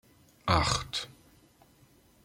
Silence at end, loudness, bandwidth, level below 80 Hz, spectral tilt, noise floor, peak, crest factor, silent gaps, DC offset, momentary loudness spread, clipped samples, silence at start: 1.15 s; -30 LUFS; 16 kHz; -48 dBFS; -3.5 dB/octave; -62 dBFS; -10 dBFS; 24 dB; none; under 0.1%; 13 LU; under 0.1%; 0.45 s